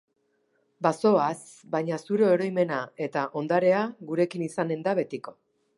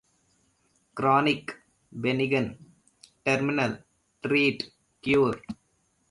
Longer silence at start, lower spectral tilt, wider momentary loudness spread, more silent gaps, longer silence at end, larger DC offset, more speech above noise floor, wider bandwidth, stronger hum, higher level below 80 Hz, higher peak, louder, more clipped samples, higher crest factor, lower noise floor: second, 0.8 s vs 0.95 s; about the same, -6.5 dB/octave vs -6 dB/octave; second, 9 LU vs 19 LU; neither; second, 0.45 s vs 0.6 s; neither; about the same, 45 dB vs 45 dB; about the same, 11.5 kHz vs 11.5 kHz; neither; second, -78 dBFS vs -62 dBFS; about the same, -8 dBFS vs -10 dBFS; about the same, -26 LUFS vs -26 LUFS; neither; about the same, 20 dB vs 18 dB; about the same, -71 dBFS vs -70 dBFS